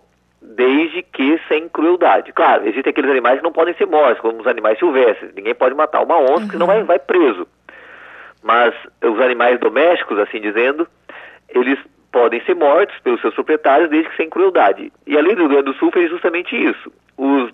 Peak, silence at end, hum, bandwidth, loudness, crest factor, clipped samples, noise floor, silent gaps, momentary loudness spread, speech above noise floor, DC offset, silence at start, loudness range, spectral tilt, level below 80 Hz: -2 dBFS; 0.05 s; 60 Hz at -60 dBFS; 5.4 kHz; -15 LUFS; 12 dB; under 0.1%; -47 dBFS; none; 7 LU; 33 dB; under 0.1%; 0.5 s; 2 LU; -7 dB/octave; -66 dBFS